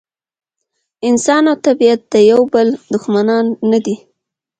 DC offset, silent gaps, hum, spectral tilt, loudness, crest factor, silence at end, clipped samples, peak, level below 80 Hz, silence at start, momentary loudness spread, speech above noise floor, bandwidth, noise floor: under 0.1%; none; none; -5 dB/octave; -13 LUFS; 14 dB; 0.65 s; under 0.1%; 0 dBFS; -60 dBFS; 1.05 s; 9 LU; 60 dB; 9.2 kHz; -72 dBFS